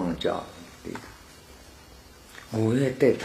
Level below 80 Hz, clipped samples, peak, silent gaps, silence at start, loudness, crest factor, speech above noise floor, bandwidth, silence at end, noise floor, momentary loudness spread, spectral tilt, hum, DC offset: -54 dBFS; under 0.1%; -8 dBFS; none; 0 s; -27 LUFS; 20 dB; 24 dB; 15 kHz; 0 s; -50 dBFS; 25 LU; -6.5 dB/octave; none; under 0.1%